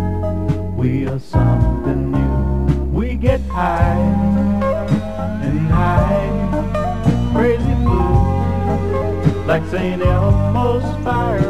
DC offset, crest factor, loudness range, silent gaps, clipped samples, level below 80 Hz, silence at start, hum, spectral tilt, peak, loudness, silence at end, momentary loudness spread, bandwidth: 2%; 14 dB; 1 LU; none; under 0.1%; -24 dBFS; 0 s; none; -9 dB/octave; -2 dBFS; -17 LUFS; 0 s; 5 LU; 10.5 kHz